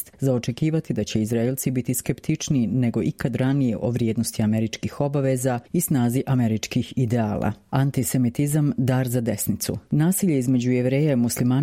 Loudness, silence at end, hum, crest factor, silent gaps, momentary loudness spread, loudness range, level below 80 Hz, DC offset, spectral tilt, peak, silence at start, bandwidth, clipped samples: -23 LUFS; 0 s; none; 16 dB; none; 4 LU; 2 LU; -52 dBFS; under 0.1%; -6 dB/octave; -6 dBFS; 0 s; 16.5 kHz; under 0.1%